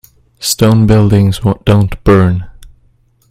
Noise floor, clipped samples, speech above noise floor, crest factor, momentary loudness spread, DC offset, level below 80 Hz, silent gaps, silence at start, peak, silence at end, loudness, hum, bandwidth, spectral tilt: -51 dBFS; under 0.1%; 42 dB; 10 dB; 7 LU; under 0.1%; -28 dBFS; none; 0.4 s; 0 dBFS; 0.65 s; -10 LUFS; none; 16 kHz; -6.5 dB/octave